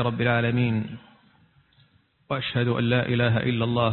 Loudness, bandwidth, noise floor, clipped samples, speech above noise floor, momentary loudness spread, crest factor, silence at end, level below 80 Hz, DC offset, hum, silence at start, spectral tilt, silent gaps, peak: -24 LUFS; 4.3 kHz; -61 dBFS; under 0.1%; 38 dB; 9 LU; 16 dB; 0 s; -54 dBFS; under 0.1%; none; 0 s; -11.5 dB/octave; none; -8 dBFS